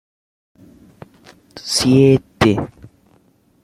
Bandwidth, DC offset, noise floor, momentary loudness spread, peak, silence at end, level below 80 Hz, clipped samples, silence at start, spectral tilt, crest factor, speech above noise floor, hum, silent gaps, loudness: 15.5 kHz; under 0.1%; -56 dBFS; 17 LU; 0 dBFS; 0.95 s; -46 dBFS; under 0.1%; 1.55 s; -5.5 dB/octave; 18 dB; 42 dB; none; none; -15 LUFS